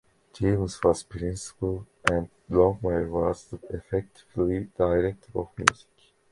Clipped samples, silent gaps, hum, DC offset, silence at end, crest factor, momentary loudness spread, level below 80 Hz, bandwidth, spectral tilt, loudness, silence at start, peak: under 0.1%; none; none; under 0.1%; 0.6 s; 26 dB; 11 LU; -44 dBFS; 11.5 kHz; -5.5 dB/octave; -27 LUFS; 0.35 s; 0 dBFS